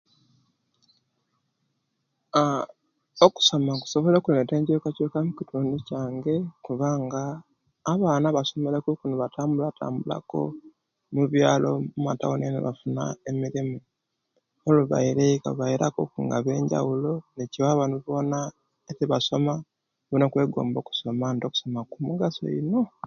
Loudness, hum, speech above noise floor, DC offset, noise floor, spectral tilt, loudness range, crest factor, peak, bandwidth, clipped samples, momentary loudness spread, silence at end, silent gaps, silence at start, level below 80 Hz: -25 LUFS; none; 52 dB; under 0.1%; -77 dBFS; -6 dB/octave; 4 LU; 24 dB; -2 dBFS; 7.4 kHz; under 0.1%; 10 LU; 0 s; none; 2.35 s; -64 dBFS